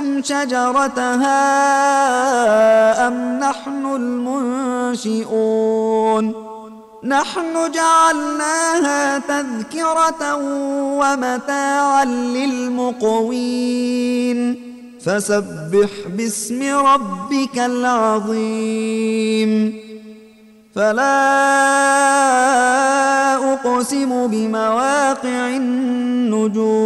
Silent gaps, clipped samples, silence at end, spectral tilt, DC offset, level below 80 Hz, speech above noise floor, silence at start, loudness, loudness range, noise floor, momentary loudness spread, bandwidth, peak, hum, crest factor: none; under 0.1%; 0 s; -3.5 dB/octave; under 0.1%; -60 dBFS; 30 dB; 0 s; -17 LUFS; 5 LU; -46 dBFS; 8 LU; 14 kHz; -4 dBFS; none; 12 dB